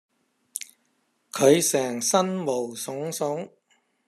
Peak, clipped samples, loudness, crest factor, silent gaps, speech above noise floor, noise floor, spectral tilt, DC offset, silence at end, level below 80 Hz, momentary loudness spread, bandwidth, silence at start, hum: -4 dBFS; under 0.1%; -24 LUFS; 22 dB; none; 47 dB; -70 dBFS; -3.5 dB/octave; under 0.1%; 0.6 s; -74 dBFS; 17 LU; 14.5 kHz; 0.55 s; none